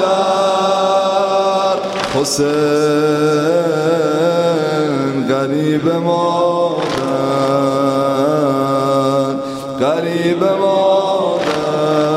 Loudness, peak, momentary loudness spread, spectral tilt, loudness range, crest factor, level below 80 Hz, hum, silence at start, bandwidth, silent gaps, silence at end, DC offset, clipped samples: -15 LUFS; -2 dBFS; 3 LU; -5.5 dB/octave; 1 LU; 14 dB; -54 dBFS; none; 0 s; 15 kHz; none; 0 s; under 0.1%; under 0.1%